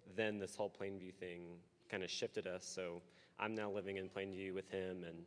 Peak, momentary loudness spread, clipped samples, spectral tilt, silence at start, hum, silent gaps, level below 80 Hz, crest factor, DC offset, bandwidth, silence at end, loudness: -26 dBFS; 10 LU; under 0.1%; -4 dB/octave; 0 s; none; none; -84 dBFS; 22 dB; under 0.1%; 11 kHz; 0 s; -46 LUFS